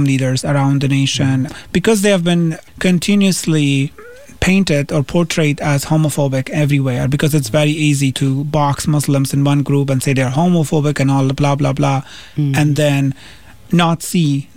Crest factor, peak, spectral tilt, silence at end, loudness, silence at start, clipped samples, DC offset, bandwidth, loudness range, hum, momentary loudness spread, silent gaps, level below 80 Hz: 14 dB; -2 dBFS; -6 dB/octave; 0.15 s; -15 LUFS; 0 s; under 0.1%; 1%; 16 kHz; 1 LU; none; 4 LU; none; -40 dBFS